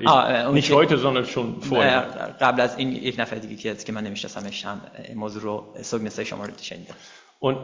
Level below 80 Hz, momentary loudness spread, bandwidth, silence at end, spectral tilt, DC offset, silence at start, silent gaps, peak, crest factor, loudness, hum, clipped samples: -60 dBFS; 16 LU; 7.6 kHz; 0 s; -5 dB/octave; under 0.1%; 0 s; none; -2 dBFS; 20 dB; -23 LUFS; none; under 0.1%